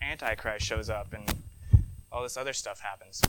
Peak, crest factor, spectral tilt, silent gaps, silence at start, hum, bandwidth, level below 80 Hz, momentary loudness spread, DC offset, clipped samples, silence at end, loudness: -6 dBFS; 24 dB; -4 dB/octave; none; 0 s; none; 19 kHz; -36 dBFS; 12 LU; under 0.1%; under 0.1%; 0 s; -32 LUFS